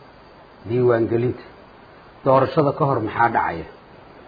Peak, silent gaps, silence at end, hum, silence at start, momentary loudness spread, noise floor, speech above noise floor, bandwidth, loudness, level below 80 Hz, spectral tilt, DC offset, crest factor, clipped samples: -4 dBFS; none; 0.55 s; none; 0.65 s; 16 LU; -46 dBFS; 27 dB; 5 kHz; -20 LUFS; -54 dBFS; -10.5 dB/octave; under 0.1%; 18 dB; under 0.1%